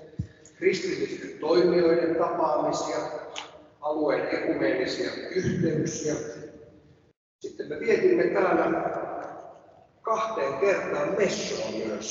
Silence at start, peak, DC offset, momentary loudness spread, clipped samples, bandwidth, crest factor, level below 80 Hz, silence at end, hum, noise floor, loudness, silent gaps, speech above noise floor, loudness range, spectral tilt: 0 s; -10 dBFS; under 0.1%; 17 LU; under 0.1%; 7.8 kHz; 16 dB; -60 dBFS; 0 s; none; -55 dBFS; -26 LUFS; 7.16-7.39 s; 30 dB; 3 LU; -5 dB/octave